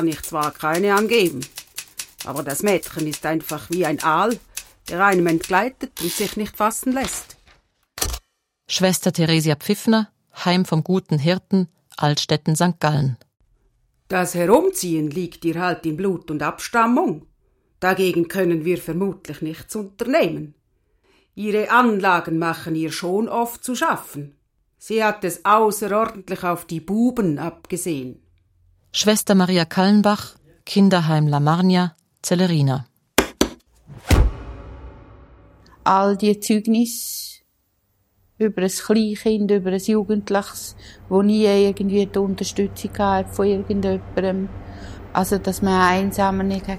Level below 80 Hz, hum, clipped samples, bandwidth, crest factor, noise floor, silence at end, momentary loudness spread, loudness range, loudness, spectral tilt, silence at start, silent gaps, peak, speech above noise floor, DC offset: -38 dBFS; none; under 0.1%; 16.5 kHz; 20 dB; -67 dBFS; 0 s; 14 LU; 4 LU; -20 LUFS; -5 dB/octave; 0 s; none; 0 dBFS; 47 dB; under 0.1%